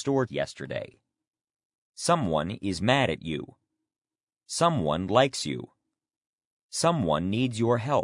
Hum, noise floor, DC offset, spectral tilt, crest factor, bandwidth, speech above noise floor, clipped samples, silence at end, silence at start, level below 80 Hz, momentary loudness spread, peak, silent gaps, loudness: none; -88 dBFS; under 0.1%; -5 dB/octave; 22 dB; 11 kHz; 61 dB; under 0.1%; 0 s; 0 s; -60 dBFS; 12 LU; -6 dBFS; 1.65-1.93 s, 4.23-4.27 s, 6.17-6.21 s, 6.27-6.38 s, 6.45-6.57 s, 6.63-6.69 s; -27 LUFS